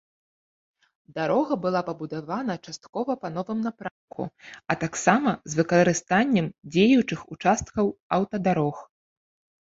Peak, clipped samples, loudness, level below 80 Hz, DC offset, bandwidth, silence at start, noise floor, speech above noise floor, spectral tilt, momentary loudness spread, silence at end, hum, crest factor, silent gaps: -4 dBFS; under 0.1%; -25 LUFS; -58 dBFS; under 0.1%; 8 kHz; 1.15 s; under -90 dBFS; over 65 dB; -5.5 dB/octave; 15 LU; 0.8 s; none; 22 dB; 2.89-2.93 s, 3.91-4.08 s, 8.00-8.10 s